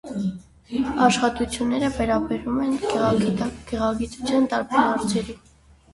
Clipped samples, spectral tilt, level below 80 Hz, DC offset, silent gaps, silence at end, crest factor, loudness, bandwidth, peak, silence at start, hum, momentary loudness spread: under 0.1%; -5 dB/octave; -44 dBFS; under 0.1%; none; 0.55 s; 20 dB; -23 LUFS; 11.5 kHz; -4 dBFS; 0.05 s; none; 9 LU